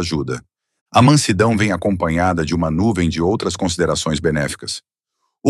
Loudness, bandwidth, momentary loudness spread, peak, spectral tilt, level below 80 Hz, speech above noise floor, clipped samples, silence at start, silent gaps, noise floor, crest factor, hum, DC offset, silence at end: -17 LUFS; 13 kHz; 12 LU; 0 dBFS; -5.5 dB/octave; -42 dBFS; 56 dB; under 0.1%; 0 s; 0.81-0.86 s; -73 dBFS; 18 dB; none; under 0.1%; 0 s